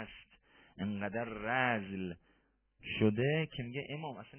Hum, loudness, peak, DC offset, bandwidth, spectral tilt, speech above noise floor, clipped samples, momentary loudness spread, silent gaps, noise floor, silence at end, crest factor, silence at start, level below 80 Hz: none; -36 LUFS; -18 dBFS; under 0.1%; 3.3 kHz; -4.5 dB/octave; 38 dB; under 0.1%; 16 LU; none; -74 dBFS; 0 s; 20 dB; 0 s; -64 dBFS